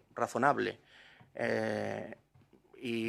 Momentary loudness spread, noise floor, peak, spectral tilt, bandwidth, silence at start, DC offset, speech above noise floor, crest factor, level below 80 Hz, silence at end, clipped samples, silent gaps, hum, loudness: 20 LU; -65 dBFS; -12 dBFS; -5.5 dB/octave; 15 kHz; 0.15 s; under 0.1%; 31 dB; 24 dB; -76 dBFS; 0 s; under 0.1%; none; none; -34 LUFS